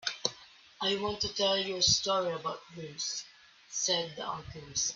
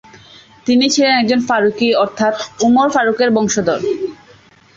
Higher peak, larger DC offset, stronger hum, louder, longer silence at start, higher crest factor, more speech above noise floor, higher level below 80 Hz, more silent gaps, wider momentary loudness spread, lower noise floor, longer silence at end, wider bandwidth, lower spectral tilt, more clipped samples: second, -10 dBFS vs -2 dBFS; neither; neither; second, -31 LUFS vs -14 LUFS; second, 0 s vs 0.65 s; first, 24 dB vs 12 dB; second, 23 dB vs 32 dB; second, -62 dBFS vs -54 dBFS; neither; first, 14 LU vs 7 LU; first, -55 dBFS vs -46 dBFS; second, 0 s vs 0.6 s; about the same, 7.8 kHz vs 8 kHz; second, -1.5 dB/octave vs -3.5 dB/octave; neither